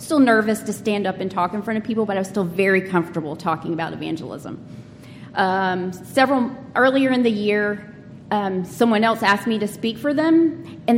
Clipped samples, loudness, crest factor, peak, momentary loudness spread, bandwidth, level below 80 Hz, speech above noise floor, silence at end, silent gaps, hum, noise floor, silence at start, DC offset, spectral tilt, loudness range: under 0.1%; -20 LUFS; 18 dB; -4 dBFS; 12 LU; 16.5 kHz; -60 dBFS; 20 dB; 0 s; none; none; -40 dBFS; 0 s; under 0.1%; -5.5 dB/octave; 4 LU